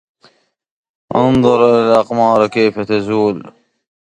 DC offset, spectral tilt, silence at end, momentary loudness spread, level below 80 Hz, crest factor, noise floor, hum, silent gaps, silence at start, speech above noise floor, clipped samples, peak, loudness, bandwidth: under 0.1%; -7 dB/octave; 0.55 s; 8 LU; -46 dBFS; 14 dB; -54 dBFS; none; none; 1.1 s; 42 dB; under 0.1%; 0 dBFS; -13 LUFS; 10.5 kHz